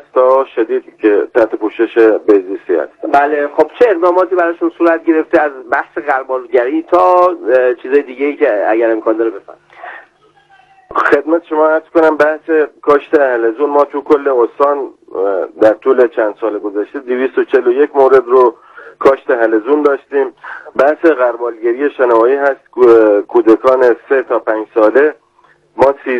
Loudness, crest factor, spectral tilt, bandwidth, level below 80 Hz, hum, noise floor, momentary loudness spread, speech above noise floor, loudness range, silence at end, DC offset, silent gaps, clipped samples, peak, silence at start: -12 LUFS; 12 dB; -6.5 dB/octave; 7 kHz; -58 dBFS; none; -50 dBFS; 8 LU; 39 dB; 4 LU; 0 s; under 0.1%; none; 0.8%; 0 dBFS; 0.15 s